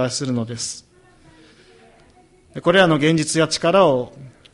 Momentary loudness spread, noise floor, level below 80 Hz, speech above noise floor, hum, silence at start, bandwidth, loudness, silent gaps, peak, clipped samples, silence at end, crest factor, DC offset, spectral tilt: 16 LU; -52 dBFS; -56 dBFS; 34 dB; none; 0 s; 11.5 kHz; -18 LUFS; none; 0 dBFS; under 0.1%; 0.25 s; 20 dB; under 0.1%; -4.5 dB/octave